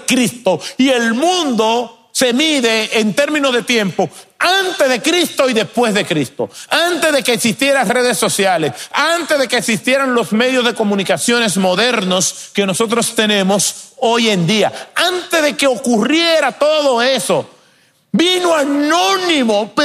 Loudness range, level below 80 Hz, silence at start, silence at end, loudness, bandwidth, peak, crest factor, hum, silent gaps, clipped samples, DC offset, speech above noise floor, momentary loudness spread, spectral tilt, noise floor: 1 LU; -62 dBFS; 0 s; 0 s; -14 LUFS; 15.5 kHz; 0 dBFS; 14 dB; none; none; under 0.1%; under 0.1%; 39 dB; 5 LU; -3 dB/octave; -53 dBFS